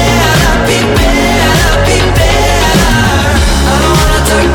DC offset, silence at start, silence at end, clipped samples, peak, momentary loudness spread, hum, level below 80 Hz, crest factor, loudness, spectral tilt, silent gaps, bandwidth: under 0.1%; 0 s; 0 s; under 0.1%; 0 dBFS; 1 LU; none; -14 dBFS; 8 dB; -8 LUFS; -4.5 dB/octave; none; 19 kHz